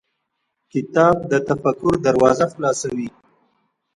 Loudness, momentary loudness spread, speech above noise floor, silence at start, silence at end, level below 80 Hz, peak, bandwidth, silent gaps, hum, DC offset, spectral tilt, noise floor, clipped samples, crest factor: -19 LUFS; 12 LU; 57 dB; 0.75 s; 0.85 s; -52 dBFS; 0 dBFS; 11 kHz; none; none; under 0.1%; -6 dB/octave; -74 dBFS; under 0.1%; 20 dB